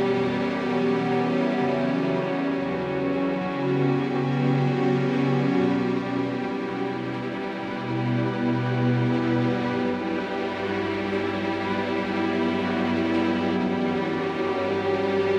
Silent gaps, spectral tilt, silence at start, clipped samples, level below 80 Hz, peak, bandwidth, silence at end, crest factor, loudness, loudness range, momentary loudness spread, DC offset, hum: none; -8 dB/octave; 0 s; under 0.1%; -60 dBFS; -12 dBFS; 8.4 kHz; 0 s; 12 dB; -25 LUFS; 2 LU; 5 LU; under 0.1%; none